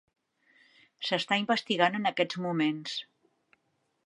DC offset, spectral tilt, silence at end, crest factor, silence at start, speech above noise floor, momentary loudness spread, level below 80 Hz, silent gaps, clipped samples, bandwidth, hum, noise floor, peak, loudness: under 0.1%; -5 dB/octave; 1.05 s; 24 dB; 1 s; 47 dB; 11 LU; -84 dBFS; none; under 0.1%; 11.5 kHz; none; -76 dBFS; -8 dBFS; -29 LUFS